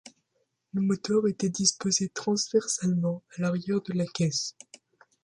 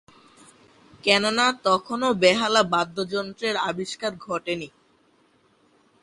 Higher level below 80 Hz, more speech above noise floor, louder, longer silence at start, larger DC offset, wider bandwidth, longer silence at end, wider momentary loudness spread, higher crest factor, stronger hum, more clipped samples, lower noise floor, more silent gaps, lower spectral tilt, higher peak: about the same, -68 dBFS vs -64 dBFS; first, 49 dB vs 39 dB; second, -28 LUFS vs -23 LUFS; second, 0.05 s vs 1.05 s; neither; about the same, 11.5 kHz vs 11.5 kHz; second, 0.75 s vs 1.35 s; second, 7 LU vs 12 LU; about the same, 22 dB vs 22 dB; neither; neither; first, -76 dBFS vs -62 dBFS; neither; about the same, -4.5 dB/octave vs -3.5 dB/octave; about the same, -6 dBFS vs -4 dBFS